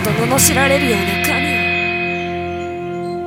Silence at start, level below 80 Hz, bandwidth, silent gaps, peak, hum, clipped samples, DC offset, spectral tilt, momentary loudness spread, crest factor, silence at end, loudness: 0 s; -40 dBFS; 17 kHz; none; 0 dBFS; none; under 0.1%; under 0.1%; -3.5 dB/octave; 12 LU; 16 dB; 0 s; -15 LUFS